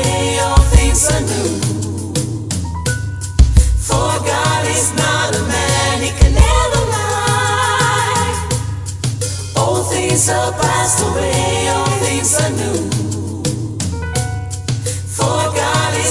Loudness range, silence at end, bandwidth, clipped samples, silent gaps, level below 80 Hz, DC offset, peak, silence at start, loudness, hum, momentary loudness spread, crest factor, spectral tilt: 3 LU; 0 s; 12 kHz; under 0.1%; none; -20 dBFS; 0.1%; 0 dBFS; 0 s; -15 LUFS; none; 8 LU; 14 dB; -4 dB/octave